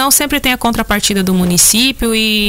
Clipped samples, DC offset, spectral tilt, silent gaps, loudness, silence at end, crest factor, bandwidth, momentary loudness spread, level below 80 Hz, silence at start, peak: under 0.1%; under 0.1%; -2.5 dB/octave; none; -11 LUFS; 0 s; 12 dB; 16.5 kHz; 5 LU; -30 dBFS; 0 s; 0 dBFS